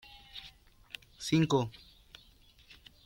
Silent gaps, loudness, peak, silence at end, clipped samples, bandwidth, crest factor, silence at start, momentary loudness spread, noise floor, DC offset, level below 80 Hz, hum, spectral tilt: none; -31 LUFS; -16 dBFS; 1.35 s; under 0.1%; 16.5 kHz; 20 dB; 0.35 s; 27 LU; -61 dBFS; under 0.1%; -62 dBFS; none; -6 dB/octave